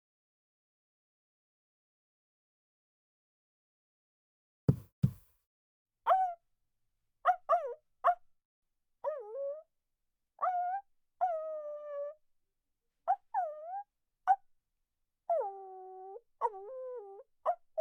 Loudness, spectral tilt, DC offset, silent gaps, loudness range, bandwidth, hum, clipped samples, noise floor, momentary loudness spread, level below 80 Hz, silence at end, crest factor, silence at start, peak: -36 LUFS; -9 dB/octave; under 0.1%; 4.92-5.02 s, 5.47-5.86 s, 8.45-8.62 s; 5 LU; 17.5 kHz; none; under 0.1%; -84 dBFS; 16 LU; -66 dBFS; 0 s; 24 dB; 4.7 s; -14 dBFS